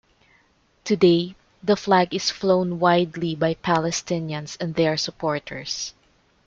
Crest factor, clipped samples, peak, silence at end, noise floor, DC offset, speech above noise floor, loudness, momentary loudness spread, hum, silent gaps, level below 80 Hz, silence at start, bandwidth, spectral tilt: 18 dB; under 0.1%; -4 dBFS; 0.55 s; -61 dBFS; under 0.1%; 40 dB; -22 LUFS; 11 LU; none; none; -58 dBFS; 0.85 s; 7.8 kHz; -5 dB/octave